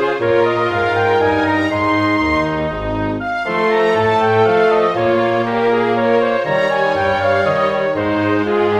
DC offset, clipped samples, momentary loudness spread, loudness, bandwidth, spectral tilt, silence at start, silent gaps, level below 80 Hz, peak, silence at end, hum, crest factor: 0.1%; under 0.1%; 5 LU; -15 LUFS; 9.8 kHz; -6.5 dB/octave; 0 s; none; -40 dBFS; -2 dBFS; 0 s; none; 12 dB